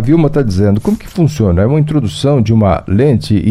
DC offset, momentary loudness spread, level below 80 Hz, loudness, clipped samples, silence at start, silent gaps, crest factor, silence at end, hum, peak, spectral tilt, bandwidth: under 0.1%; 4 LU; -30 dBFS; -12 LUFS; under 0.1%; 0 s; none; 10 dB; 0 s; none; 0 dBFS; -8 dB/octave; 13.5 kHz